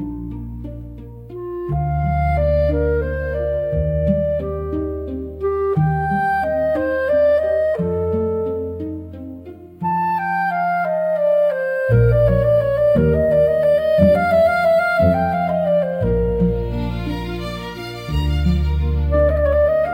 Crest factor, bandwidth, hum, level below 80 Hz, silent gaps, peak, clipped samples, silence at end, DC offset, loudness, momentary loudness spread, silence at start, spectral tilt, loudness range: 16 dB; 16.5 kHz; none; -28 dBFS; none; -2 dBFS; under 0.1%; 0 s; under 0.1%; -18 LUFS; 14 LU; 0 s; -8.5 dB/octave; 6 LU